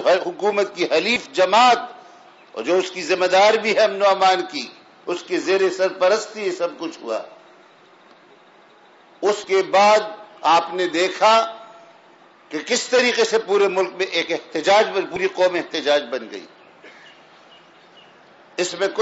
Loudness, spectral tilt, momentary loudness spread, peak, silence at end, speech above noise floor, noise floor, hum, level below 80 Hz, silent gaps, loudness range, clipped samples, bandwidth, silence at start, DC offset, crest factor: -19 LUFS; -2.5 dB/octave; 14 LU; -4 dBFS; 0 s; 31 dB; -50 dBFS; none; -70 dBFS; none; 7 LU; under 0.1%; 8 kHz; 0 s; under 0.1%; 16 dB